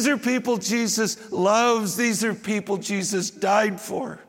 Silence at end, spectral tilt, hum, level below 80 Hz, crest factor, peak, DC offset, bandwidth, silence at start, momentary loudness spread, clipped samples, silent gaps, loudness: 0.05 s; -3.5 dB/octave; none; -72 dBFS; 18 dB; -6 dBFS; under 0.1%; 17 kHz; 0 s; 7 LU; under 0.1%; none; -23 LUFS